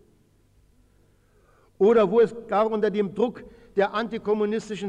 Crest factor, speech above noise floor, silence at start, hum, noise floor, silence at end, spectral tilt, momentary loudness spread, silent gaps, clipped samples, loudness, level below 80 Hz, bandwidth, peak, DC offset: 14 dB; 38 dB; 1.8 s; none; -61 dBFS; 0 s; -6.5 dB/octave; 9 LU; none; under 0.1%; -23 LUFS; -60 dBFS; 9.2 kHz; -10 dBFS; under 0.1%